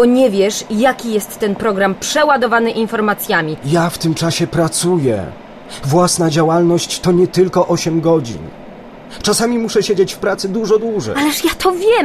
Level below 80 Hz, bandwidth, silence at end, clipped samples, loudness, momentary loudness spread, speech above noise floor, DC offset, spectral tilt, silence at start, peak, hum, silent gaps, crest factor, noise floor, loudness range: -44 dBFS; 14.5 kHz; 0 s; under 0.1%; -15 LUFS; 8 LU; 20 dB; under 0.1%; -4.5 dB/octave; 0 s; -2 dBFS; none; none; 12 dB; -34 dBFS; 2 LU